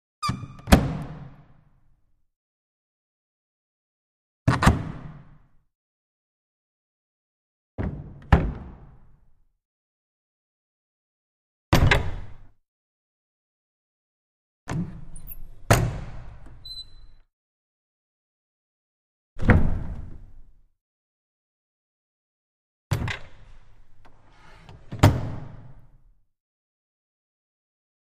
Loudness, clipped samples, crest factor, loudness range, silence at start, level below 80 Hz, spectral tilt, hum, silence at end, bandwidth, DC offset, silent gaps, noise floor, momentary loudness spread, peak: -24 LUFS; under 0.1%; 28 dB; 12 LU; 0.2 s; -36 dBFS; -6 dB/octave; none; 2.35 s; 15 kHz; under 0.1%; 2.36-4.46 s, 5.75-7.78 s, 9.65-11.72 s, 12.68-14.67 s, 17.33-19.36 s, 20.81-22.90 s; -62 dBFS; 24 LU; 0 dBFS